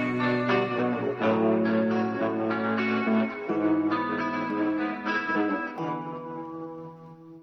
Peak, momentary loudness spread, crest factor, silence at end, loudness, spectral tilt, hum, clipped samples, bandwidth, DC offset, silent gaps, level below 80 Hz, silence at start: -12 dBFS; 13 LU; 14 dB; 0 s; -27 LUFS; -7.5 dB/octave; none; under 0.1%; 6.2 kHz; under 0.1%; none; -68 dBFS; 0 s